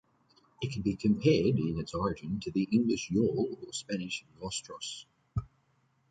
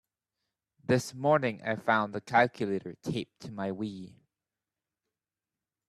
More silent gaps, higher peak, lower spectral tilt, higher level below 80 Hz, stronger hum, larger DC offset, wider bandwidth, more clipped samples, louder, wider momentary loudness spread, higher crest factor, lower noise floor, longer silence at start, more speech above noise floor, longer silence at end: neither; about the same, -12 dBFS vs -10 dBFS; about the same, -6 dB/octave vs -6 dB/octave; first, -54 dBFS vs -72 dBFS; neither; neither; second, 9.4 kHz vs 13.5 kHz; neither; about the same, -32 LUFS vs -30 LUFS; about the same, 13 LU vs 14 LU; about the same, 20 dB vs 22 dB; second, -71 dBFS vs under -90 dBFS; second, 0.6 s vs 0.9 s; second, 41 dB vs over 60 dB; second, 0.65 s vs 1.8 s